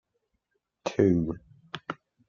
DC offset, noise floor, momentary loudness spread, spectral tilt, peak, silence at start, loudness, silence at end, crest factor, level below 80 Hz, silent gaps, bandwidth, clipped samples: under 0.1%; -79 dBFS; 18 LU; -7.5 dB/octave; -10 dBFS; 0.85 s; -28 LUFS; 0.35 s; 22 dB; -58 dBFS; none; 7.2 kHz; under 0.1%